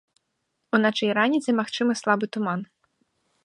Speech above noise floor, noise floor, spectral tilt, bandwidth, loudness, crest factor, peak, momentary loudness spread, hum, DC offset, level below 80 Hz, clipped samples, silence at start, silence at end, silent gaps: 54 dB; -77 dBFS; -5 dB/octave; 11 kHz; -24 LUFS; 20 dB; -6 dBFS; 7 LU; none; under 0.1%; -76 dBFS; under 0.1%; 0.75 s; 0.8 s; none